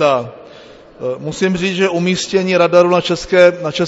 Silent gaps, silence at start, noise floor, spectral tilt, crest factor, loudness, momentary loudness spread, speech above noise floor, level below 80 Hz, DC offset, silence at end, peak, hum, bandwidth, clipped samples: none; 0 s; -39 dBFS; -5 dB/octave; 14 dB; -14 LUFS; 12 LU; 25 dB; -46 dBFS; under 0.1%; 0 s; 0 dBFS; none; 8 kHz; under 0.1%